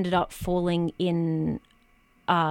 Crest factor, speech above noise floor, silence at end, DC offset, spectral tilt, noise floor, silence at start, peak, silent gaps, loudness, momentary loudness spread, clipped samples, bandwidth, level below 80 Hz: 18 dB; 35 dB; 0 s; under 0.1%; -7 dB/octave; -61 dBFS; 0 s; -8 dBFS; none; -27 LUFS; 7 LU; under 0.1%; 16.5 kHz; -48 dBFS